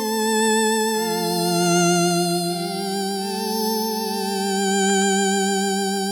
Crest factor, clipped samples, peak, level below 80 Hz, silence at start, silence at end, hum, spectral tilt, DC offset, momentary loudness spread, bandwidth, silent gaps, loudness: 14 dB; under 0.1%; -6 dBFS; -68 dBFS; 0 s; 0 s; none; -3.5 dB/octave; under 0.1%; 6 LU; 17.5 kHz; none; -20 LUFS